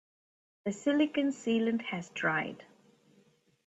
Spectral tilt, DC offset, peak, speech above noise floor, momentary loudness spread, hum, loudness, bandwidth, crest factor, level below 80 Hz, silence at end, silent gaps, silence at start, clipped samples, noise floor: -5 dB/octave; under 0.1%; -16 dBFS; 36 dB; 12 LU; none; -32 LUFS; 8.2 kHz; 16 dB; -78 dBFS; 1.05 s; none; 0.65 s; under 0.1%; -67 dBFS